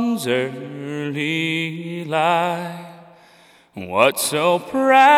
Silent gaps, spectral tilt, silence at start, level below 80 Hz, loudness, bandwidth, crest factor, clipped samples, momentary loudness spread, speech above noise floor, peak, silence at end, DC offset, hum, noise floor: none; -4 dB/octave; 0 s; -68 dBFS; -20 LUFS; 16.5 kHz; 18 dB; under 0.1%; 15 LU; 32 dB; -2 dBFS; 0 s; under 0.1%; none; -51 dBFS